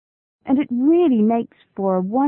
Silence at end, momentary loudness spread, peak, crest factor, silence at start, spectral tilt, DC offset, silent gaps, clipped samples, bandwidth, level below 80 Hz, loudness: 0 s; 12 LU; -8 dBFS; 12 dB; 0.45 s; -13 dB/octave; under 0.1%; none; under 0.1%; 3.8 kHz; -62 dBFS; -19 LUFS